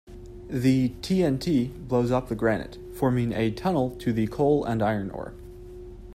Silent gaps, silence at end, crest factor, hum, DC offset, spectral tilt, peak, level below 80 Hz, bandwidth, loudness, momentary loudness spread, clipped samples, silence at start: none; 0 s; 16 dB; none; under 0.1%; -7.5 dB/octave; -10 dBFS; -46 dBFS; 14.5 kHz; -26 LUFS; 20 LU; under 0.1%; 0.1 s